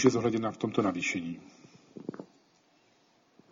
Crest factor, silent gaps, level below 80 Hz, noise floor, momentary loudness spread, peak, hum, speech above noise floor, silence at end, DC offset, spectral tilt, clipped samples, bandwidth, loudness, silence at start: 24 dB; none; -70 dBFS; -67 dBFS; 17 LU; -8 dBFS; none; 37 dB; 1.25 s; under 0.1%; -5.5 dB/octave; under 0.1%; 7.6 kHz; -31 LUFS; 0 s